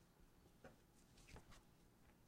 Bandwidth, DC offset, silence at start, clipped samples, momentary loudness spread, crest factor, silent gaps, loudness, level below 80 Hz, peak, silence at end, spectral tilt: 15.5 kHz; under 0.1%; 0 s; under 0.1%; 4 LU; 20 dB; none; -67 LUFS; -72 dBFS; -48 dBFS; 0 s; -4.5 dB/octave